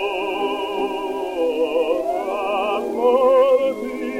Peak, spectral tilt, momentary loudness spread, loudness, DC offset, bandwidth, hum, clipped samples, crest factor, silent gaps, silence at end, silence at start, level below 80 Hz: -6 dBFS; -4 dB/octave; 9 LU; -20 LUFS; under 0.1%; 15 kHz; none; under 0.1%; 14 dB; none; 0 s; 0 s; -56 dBFS